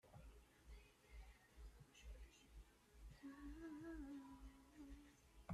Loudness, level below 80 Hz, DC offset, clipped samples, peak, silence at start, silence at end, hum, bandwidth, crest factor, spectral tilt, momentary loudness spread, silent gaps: -62 LUFS; -64 dBFS; under 0.1%; under 0.1%; -36 dBFS; 0.05 s; 0 s; none; 14 kHz; 22 dB; -6 dB/octave; 12 LU; none